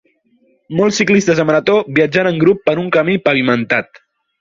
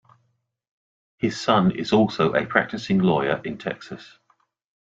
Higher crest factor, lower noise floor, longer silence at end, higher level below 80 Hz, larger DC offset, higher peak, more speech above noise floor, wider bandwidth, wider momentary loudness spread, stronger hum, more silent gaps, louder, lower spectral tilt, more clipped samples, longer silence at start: second, 14 dB vs 22 dB; second, -57 dBFS vs -71 dBFS; second, 0.55 s vs 0.75 s; about the same, -54 dBFS vs -58 dBFS; neither; about the same, 0 dBFS vs -2 dBFS; second, 43 dB vs 49 dB; about the same, 7.6 kHz vs 7.8 kHz; second, 4 LU vs 12 LU; neither; neither; first, -14 LUFS vs -22 LUFS; about the same, -5.5 dB/octave vs -6.5 dB/octave; neither; second, 0.7 s vs 1.25 s